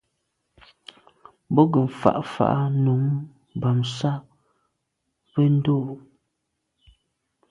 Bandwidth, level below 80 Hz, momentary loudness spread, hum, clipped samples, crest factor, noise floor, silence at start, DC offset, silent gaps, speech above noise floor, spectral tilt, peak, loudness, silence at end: 7.8 kHz; -60 dBFS; 11 LU; none; under 0.1%; 24 dB; -78 dBFS; 1.5 s; under 0.1%; none; 56 dB; -8.5 dB/octave; 0 dBFS; -23 LUFS; 1.5 s